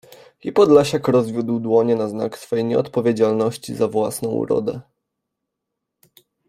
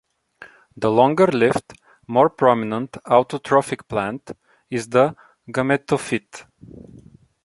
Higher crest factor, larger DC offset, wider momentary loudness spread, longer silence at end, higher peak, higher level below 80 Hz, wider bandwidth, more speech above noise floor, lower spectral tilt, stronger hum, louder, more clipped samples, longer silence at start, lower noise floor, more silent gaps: about the same, 18 dB vs 20 dB; neither; second, 10 LU vs 13 LU; first, 1.7 s vs 0.45 s; about the same, -2 dBFS vs -2 dBFS; about the same, -60 dBFS vs -58 dBFS; first, 15.5 kHz vs 11.5 kHz; first, 62 dB vs 27 dB; about the same, -6.5 dB/octave vs -6 dB/octave; neither; about the same, -19 LUFS vs -20 LUFS; neither; second, 0.1 s vs 0.4 s; first, -80 dBFS vs -47 dBFS; neither